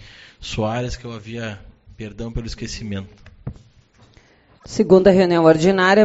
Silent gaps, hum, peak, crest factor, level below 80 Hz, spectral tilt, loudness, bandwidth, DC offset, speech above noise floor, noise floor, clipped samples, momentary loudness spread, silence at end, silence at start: none; none; 0 dBFS; 18 dB; -40 dBFS; -5 dB/octave; -18 LUFS; 8 kHz; under 0.1%; 35 dB; -52 dBFS; under 0.1%; 23 LU; 0 s; 0.4 s